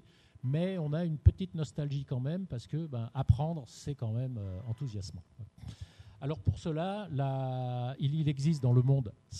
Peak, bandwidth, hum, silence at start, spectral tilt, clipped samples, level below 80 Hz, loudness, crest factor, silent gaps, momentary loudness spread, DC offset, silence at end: -10 dBFS; 9.6 kHz; none; 0.45 s; -8 dB/octave; under 0.1%; -46 dBFS; -33 LUFS; 24 dB; none; 16 LU; under 0.1%; 0 s